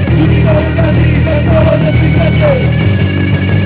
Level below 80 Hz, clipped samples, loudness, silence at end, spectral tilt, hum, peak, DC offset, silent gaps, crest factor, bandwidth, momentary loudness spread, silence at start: -18 dBFS; under 0.1%; -10 LUFS; 0 s; -11.5 dB/octave; none; -2 dBFS; 0.9%; none; 8 dB; 4 kHz; 2 LU; 0 s